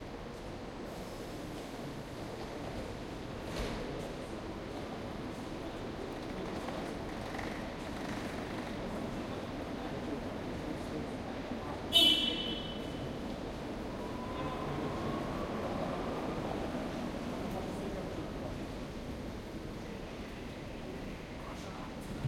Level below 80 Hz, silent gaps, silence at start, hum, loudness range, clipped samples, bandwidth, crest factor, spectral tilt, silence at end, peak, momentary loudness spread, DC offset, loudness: -50 dBFS; none; 0 s; none; 11 LU; under 0.1%; 16 kHz; 26 dB; -4.5 dB/octave; 0 s; -14 dBFS; 7 LU; under 0.1%; -38 LUFS